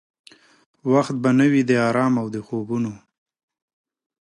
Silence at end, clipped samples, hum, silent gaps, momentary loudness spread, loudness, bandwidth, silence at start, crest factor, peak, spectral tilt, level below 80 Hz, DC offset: 1.25 s; under 0.1%; none; none; 11 LU; -20 LUFS; 11 kHz; 0.85 s; 16 dB; -6 dBFS; -7 dB/octave; -66 dBFS; under 0.1%